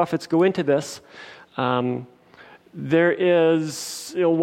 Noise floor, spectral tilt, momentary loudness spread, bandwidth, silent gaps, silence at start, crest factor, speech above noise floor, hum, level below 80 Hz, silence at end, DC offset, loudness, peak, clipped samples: -49 dBFS; -5.5 dB/octave; 18 LU; 16 kHz; none; 0 s; 16 dB; 28 dB; none; -70 dBFS; 0 s; under 0.1%; -21 LUFS; -6 dBFS; under 0.1%